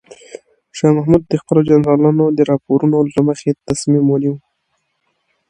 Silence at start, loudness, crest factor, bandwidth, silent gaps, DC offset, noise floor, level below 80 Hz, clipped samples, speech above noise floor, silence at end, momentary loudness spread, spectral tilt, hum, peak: 0.35 s; -14 LUFS; 14 dB; 10.5 kHz; none; under 0.1%; -68 dBFS; -48 dBFS; under 0.1%; 55 dB; 1.1 s; 7 LU; -7.5 dB/octave; none; 0 dBFS